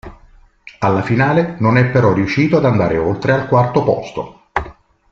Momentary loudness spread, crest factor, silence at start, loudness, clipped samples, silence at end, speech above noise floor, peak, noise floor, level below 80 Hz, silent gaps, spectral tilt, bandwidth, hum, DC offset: 11 LU; 14 dB; 0.05 s; -15 LUFS; under 0.1%; 0.4 s; 32 dB; -2 dBFS; -46 dBFS; -42 dBFS; none; -8 dB/octave; 7.2 kHz; none; under 0.1%